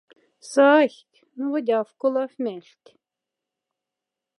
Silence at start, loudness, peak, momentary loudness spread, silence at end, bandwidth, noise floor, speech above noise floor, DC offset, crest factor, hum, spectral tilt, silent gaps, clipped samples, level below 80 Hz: 0.45 s; -22 LUFS; -4 dBFS; 15 LU; 1.8 s; 11.5 kHz; -86 dBFS; 65 dB; under 0.1%; 20 dB; none; -4 dB/octave; none; under 0.1%; -88 dBFS